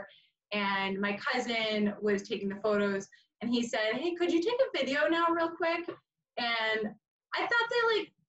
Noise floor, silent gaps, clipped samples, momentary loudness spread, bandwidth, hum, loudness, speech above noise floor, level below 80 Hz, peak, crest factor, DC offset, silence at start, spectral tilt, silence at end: -55 dBFS; 7.08-7.20 s; under 0.1%; 9 LU; 8.4 kHz; none; -31 LUFS; 24 dB; -74 dBFS; -16 dBFS; 14 dB; under 0.1%; 0 s; -4.5 dB/octave; 0.25 s